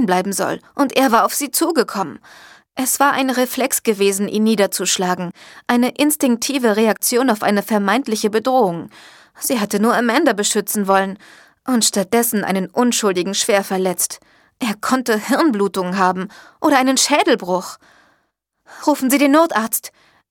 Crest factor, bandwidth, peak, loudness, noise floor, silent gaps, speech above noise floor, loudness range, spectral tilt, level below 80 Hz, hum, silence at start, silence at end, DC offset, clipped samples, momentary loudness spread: 18 dB; 18.5 kHz; 0 dBFS; -17 LUFS; -68 dBFS; none; 51 dB; 2 LU; -3.5 dB/octave; -64 dBFS; none; 0 s; 0.45 s; under 0.1%; under 0.1%; 10 LU